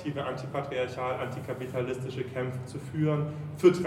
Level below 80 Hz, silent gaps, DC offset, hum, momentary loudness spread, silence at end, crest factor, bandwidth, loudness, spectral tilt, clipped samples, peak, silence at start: -62 dBFS; none; under 0.1%; none; 8 LU; 0 s; 22 dB; 13.5 kHz; -32 LUFS; -7.5 dB/octave; under 0.1%; -8 dBFS; 0 s